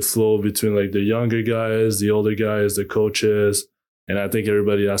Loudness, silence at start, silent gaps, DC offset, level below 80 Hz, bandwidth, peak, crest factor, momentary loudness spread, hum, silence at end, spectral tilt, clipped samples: -20 LUFS; 0 s; 3.88-4.07 s; under 0.1%; -58 dBFS; 19 kHz; -10 dBFS; 10 dB; 3 LU; none; 0 s; -5 dB/octave; under 0.1%